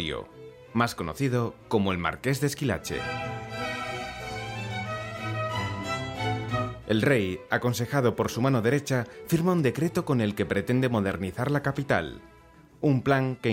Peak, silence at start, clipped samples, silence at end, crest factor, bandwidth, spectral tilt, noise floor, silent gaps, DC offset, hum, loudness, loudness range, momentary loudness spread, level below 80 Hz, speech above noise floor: -10 dBFS; 0 s; under 0.1%; 0 s; 18 dB; 16.5 kHz; -6 dB/octave; -53 dBFS; none; under 0.1%; none; -28 LUFS; 6 LU; 9 LU; -54 dBFS; 27 dB